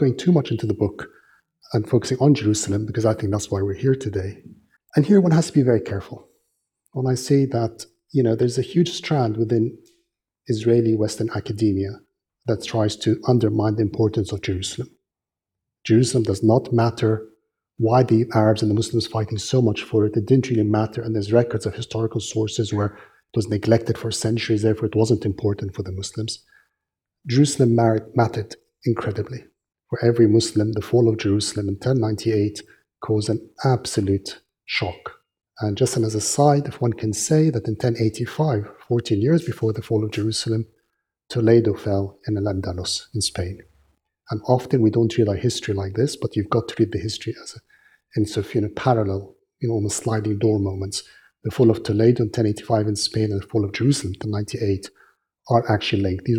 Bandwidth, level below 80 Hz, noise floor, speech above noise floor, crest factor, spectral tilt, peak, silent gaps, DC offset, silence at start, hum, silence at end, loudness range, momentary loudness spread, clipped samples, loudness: 14.5 kHz; -54 dBFS; -88 dBFS; 67 dB; 20 dB; -6 dB/octave; -2 dBFS; none; under 0.1%; 0 s; none; 0 s; 3 LU; 11 LU; under 0.1%; -21 LUFS